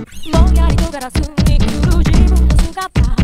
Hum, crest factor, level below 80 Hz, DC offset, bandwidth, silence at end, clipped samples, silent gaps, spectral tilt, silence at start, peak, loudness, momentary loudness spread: none; 12 dB; -14 dBFS; under 0.1%; 14 kHz; 0 s; 0.1%; none; -6.5 dB/octave; 0 s; 0 dBFS; -14 LUFS; 6 LU